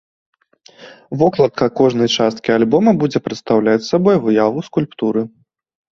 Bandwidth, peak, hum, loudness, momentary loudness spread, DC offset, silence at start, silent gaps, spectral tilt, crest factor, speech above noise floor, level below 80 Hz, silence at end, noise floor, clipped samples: 7.4 kHz; -2 dBFS; none; -15 LUFS; 8 LU; under 0.1%; 0.8 s; none; -6 dB/octave; 14 dB; 32 dB; -54 dBFS; 0.65 s; -47 dBFS; under 0.1%